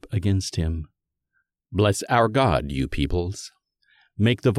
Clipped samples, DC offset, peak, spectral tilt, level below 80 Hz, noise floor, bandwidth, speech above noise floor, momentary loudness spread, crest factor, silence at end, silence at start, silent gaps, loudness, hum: under 0.1%; under 0.1%; -6 dBFS; -6 dB/octave; -38 dBFS; -74 dBFS; 13.5 kHz; 52 dB; 16 LU; 18 dB; 0 s; 0.05 s; none; -23 LUFS; none